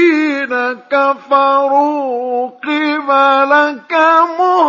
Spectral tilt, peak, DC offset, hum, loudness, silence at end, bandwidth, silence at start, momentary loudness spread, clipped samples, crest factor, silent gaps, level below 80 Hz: -3.5 dB/octave; 0 dBFS; under 0.1%; none; -13 LUFS; 0 s; 7.2 kHz; 0 s; 8 LU; under 0.1%; 12 dB; none; -78 dBFS